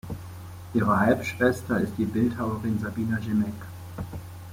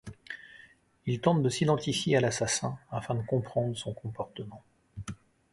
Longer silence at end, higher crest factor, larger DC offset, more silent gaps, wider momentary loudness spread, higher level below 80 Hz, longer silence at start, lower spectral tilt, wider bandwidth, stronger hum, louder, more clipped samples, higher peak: second, 0 s vs 0.4 s; about the same, 20 dB vs 22 dB; neither; neither; about the same, 17 LU vs 18 LU; first, -52 dBFS vs -60 dBFS; about the same, 0.05 s vs 0.05 s; first, -7 dB/octave vs -5 dB/octave; first, 16.5 kHz vs 11.5 kHz; neither; first, -26 LUFS vs -30 LUFS; neither; about the same, -8 dBFS vs -10 dBFS